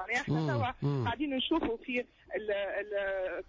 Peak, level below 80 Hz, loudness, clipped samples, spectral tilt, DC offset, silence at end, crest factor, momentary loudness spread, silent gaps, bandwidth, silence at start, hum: -20 dBFS; -56 dBFS; -33 LUFS; under 0.1%; -6.5 dB/octave; under 0.1%; 0.05 s; 12 dB; 5 LU; none; 7.6 kHz; 0 s; none